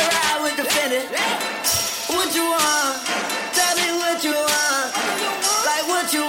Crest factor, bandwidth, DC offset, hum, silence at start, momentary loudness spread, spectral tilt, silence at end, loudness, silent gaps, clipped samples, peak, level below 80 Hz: 14 dB; 17 kHz; under 0.1%; none; 0 s; 4 LU; -0.5 dB/octave; 0 s; -19 LUFS; none; under 0.1%; -6 dBFS; -58 dBFS